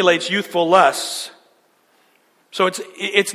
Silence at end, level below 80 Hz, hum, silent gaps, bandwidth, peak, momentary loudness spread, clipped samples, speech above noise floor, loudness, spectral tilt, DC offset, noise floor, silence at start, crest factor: 0 s; -72 dBFS; none; none; 16 kHz; 0 dBFS; 14 LU; under 0.1%; 41 dB; -18 LUFS; -3 dB/octave; under 0.1%; -59 dBFS; 0 s; 20 dB